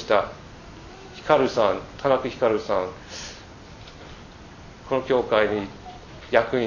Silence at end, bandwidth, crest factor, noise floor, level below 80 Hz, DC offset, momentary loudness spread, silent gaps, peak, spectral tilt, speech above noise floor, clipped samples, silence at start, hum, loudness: 0 s; 7.4 kHz; 22 dB; -43 dBFS; -50 dBFS; under 0.1%; 22 LU; none; -2 dBFS; -5 dB/octave; 21 dB; under 0.1%; 0 s; none; -23 LUFS